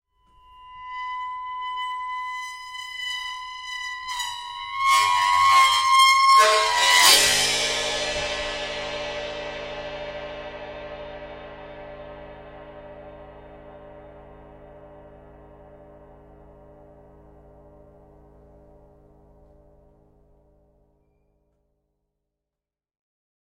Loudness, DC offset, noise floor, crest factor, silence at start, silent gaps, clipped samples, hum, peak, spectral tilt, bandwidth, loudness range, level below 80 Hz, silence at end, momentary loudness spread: -20 LUFS; under 0.1%; -89 dBFS; 26 dB; 0.6 s; none; under 0.1%; none; 0 dBFS; 0.5 dB/octave; 16.5 kHz; 24 LU; -52 dBFS; 7.45 s; 26 LU